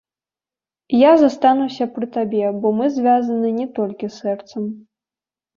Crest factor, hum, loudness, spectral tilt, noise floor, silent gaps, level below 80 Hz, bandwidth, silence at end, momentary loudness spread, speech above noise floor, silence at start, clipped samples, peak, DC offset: 16 dB; none; -18 LUFS; -7 dB/octave; under -90 dBFS; none; -64 dBFS; 7.2 kHz; 0.75 s; 13 LU; over 73 dB; 0.9 s; under 0.1%; -2 dBFS; under 0.1%